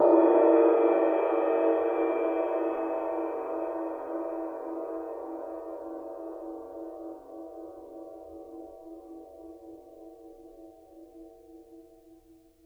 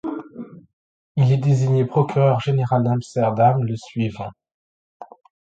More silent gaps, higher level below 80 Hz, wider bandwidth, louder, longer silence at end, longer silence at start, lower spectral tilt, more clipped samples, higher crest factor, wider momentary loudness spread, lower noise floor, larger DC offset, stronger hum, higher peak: second, none vs 0.73-1.15 s, 4.54-5.00 s; second, -68 dBFS vs -56 dBFS; second, 3.6 kHz vs 8 kHz; second, -28 LUFS vs -20 LUFS; first, 0.85 s vs 0.4 s; about the same, 0 s vs 0.05 s; second, -7 dB/octave vs -8.5 dB/octave; neither; about the same, 20 dB vs 16 dB; first, 26 LU vs 17 LU; first, -58 dBFS vs -38 dBFS; neither; neither; second, -10 dBFS vs -4 dBFS